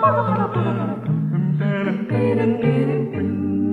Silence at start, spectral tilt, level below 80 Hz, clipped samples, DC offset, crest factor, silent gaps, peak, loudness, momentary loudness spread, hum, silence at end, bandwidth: 0 s; -10 dB/octave; -54 dBFS; under 0.1%; under 0.1%; 14 dB; none; -6 dBFS; -21 LUFS; 4 LU; none; 0 s; 4.6 kHz